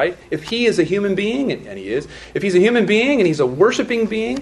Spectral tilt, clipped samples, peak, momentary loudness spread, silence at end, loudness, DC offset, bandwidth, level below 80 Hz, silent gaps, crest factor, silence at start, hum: -5.5 dB/octave; under 0.1%; -2 dBFS; 10 LU; 0 s; -18 LUFS; under 0.1%; 11.5 kHz; -50 dBFS; none; 16 dB; 0 s; none